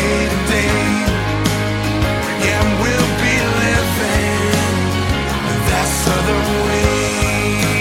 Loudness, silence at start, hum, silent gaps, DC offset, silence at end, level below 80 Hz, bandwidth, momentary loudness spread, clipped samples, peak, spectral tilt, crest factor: -16 LUFS; 0 s; none; none; under 0.1%; 0 s; -26 dBFS; 16.5 kHz; 3 LU; under 0.1%; 0 dBFS; -4.5 dB/octave; 16 dB